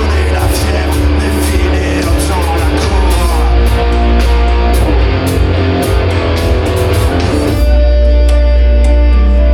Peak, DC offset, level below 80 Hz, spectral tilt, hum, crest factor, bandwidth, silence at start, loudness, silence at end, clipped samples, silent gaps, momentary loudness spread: 0 dBFS; under 0.1%; -10 dBFS; -6 dB/octave; none; 8 dB; 15 kHz; 0 s; -11 LUFS; 0 s; under 0.1%; none; 3 LU